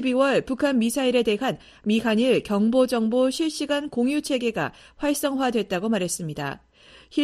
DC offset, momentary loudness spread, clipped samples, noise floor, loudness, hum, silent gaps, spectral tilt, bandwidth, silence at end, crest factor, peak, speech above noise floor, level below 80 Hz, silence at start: under 0.1%; 9 LU; under 0.1%; -50 dBFS; -24 LUFS; none; none; -4.5 dB/octave; 13.5 kHz; 0 s; 16 dB; -8 dBFS; 27 dB; -56 dBFS; 0 s